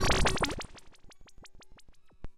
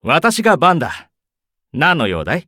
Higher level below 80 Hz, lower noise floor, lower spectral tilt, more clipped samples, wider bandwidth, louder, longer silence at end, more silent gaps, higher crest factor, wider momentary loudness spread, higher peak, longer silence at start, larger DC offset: first, -40 dBFS vs -46 dBFS; second, -52 dBFS vs -80 dBFS; about the same, -3.5 dB/octave vs -4.5 dB/octave; neither; second, 14.5 kHz vs 18.5 kHz; second, -30 LUFS vs -14 LUFS; about the same, 0.05 s vs 0.05 s; neither; first, 20 dB vs 14 dB; first, 27 LU vs 15 LU; second, -14 dBFS vs -2 dBFS; about the same, 0 s vs 0.05 s; neither